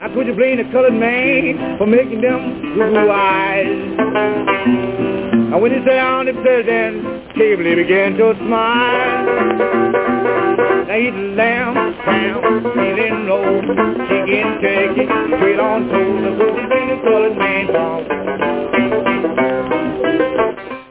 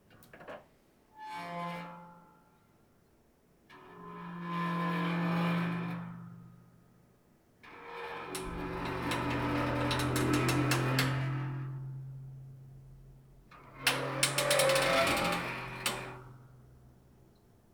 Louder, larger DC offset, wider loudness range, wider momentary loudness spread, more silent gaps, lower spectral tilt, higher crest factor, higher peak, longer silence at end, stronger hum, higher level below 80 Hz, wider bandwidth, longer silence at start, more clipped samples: first, -15 LUFS vs -32 LUFS; first, 0.1% vs under 0.1%; second, 2 LU vs 16 LU; second, 5 LU vs 23 LU; neither; first, -9.5 dB/octave vs -4.5 dB/octave; second, 12 dB vs 24 dB; first, -2 dBFS vs -12 dBFS; second, 0.05 s vs 0.95 s; neither; first, -48 dBFS vs -56 dBFS; second, 4 kHz vs over 20 kHz; second, 0 s vs 0.2 s; neither